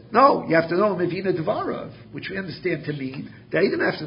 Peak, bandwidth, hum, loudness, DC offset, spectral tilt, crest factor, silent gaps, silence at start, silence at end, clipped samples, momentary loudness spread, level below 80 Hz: -2 dBFS; 5.4 kHz; none; -23 LUFS; under 0.1%; -11 dB/octave; 20 dB; none; 0 s; 0 s; under 0.1%; 16 LU; -58 dBFS